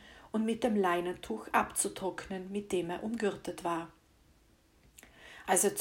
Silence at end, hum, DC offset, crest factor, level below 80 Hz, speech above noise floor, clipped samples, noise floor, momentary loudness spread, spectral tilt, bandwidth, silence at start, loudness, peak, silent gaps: 0 s; none; under 0.1%; 20 dB; -64 dBFS; 33 dB; under 0.1%; -66 dBFS; 12 LU; -3.5 dB/octave; 16.5 kHz; 0 s; -33 LUFS; -14 dBFS; none